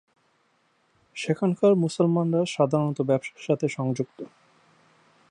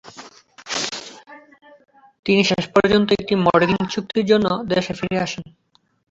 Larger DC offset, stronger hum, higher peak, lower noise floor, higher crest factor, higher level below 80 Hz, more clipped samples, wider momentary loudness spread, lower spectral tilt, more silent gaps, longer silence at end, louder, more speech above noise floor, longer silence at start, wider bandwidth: neither; neither; second, -8 dBFS vs -2 dBFS; first, -67 dBFS vs -44 dBFS; about the same, 18 dB vs 18 dB; second, -74 dBFS vs -52 dBFS; neither; about the same, 13 LU vs 13 LU; first, -7 dB/octave vs -5 dB/octave; second, none vs 2.19-2.23 s; first, 1.05 s vs 0.7 s; second, -25 LUFS vs -19 LUFS; first, 43 dB vs 25 dB; first, 1.15 s vs 0.05 s; first, 10.5 kHz vs 8 kHz